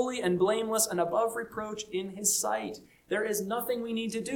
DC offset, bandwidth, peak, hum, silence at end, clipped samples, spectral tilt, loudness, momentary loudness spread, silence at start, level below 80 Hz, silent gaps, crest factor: under 0.1%; 19 kHz; -14 dBFS; none; 0 s; under 0.1%; -3 dB/octave; -30 LUFS; 9 LU; 0 s; -66 dBFS; none; 16 dB